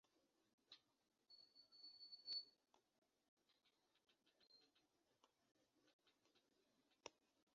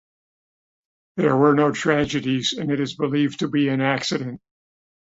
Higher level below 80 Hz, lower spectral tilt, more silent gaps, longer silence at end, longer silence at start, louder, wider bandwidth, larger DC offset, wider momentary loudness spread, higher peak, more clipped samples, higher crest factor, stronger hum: second, under -90 dBFS vs -56 dBFS; second, 2 dB/octave vs -5.5 dB/octave; first, 0.53-0.58 s, 3.28-3.37 s, 5.93-5.99 s vs none; second, 0.4 s vs 0.7 s; second, 0.15 s vs 1.15 s; second, -56 LUFS vs -21 LUFS; second, 6.8 kHz vs 8 kHz; neither; first, 18 LU vs 10 LU; second, -38 dBFS vs -4 dBFS; neither; first, 28 dB vs 18 dB; neither